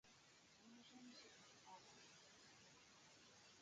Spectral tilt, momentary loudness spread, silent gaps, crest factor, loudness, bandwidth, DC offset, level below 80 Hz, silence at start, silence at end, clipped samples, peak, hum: -2 dB/octave; 6 LU; none; 18 dB; -65 LUFS; 9 kHz; under 0.1%; under -90 dBFS; 0.05 s; 0 s; under 0.1%; -50 dBFS; none